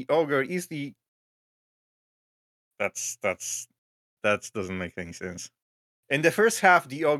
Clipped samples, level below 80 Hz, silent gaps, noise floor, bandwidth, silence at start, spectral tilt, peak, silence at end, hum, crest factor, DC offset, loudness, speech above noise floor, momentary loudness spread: under 0.1%; -74 dBFS; 1.08-2.71 s, 3.78-4.17 s, 5.62-6.03 s; under -90 dBFS; 16 kHz; 0 s; -3.5 dB/octave; -4 dBFS; 0 s; none; 24 dB; under 0.1%; -26 LUFS; over 64 dB; 17 LU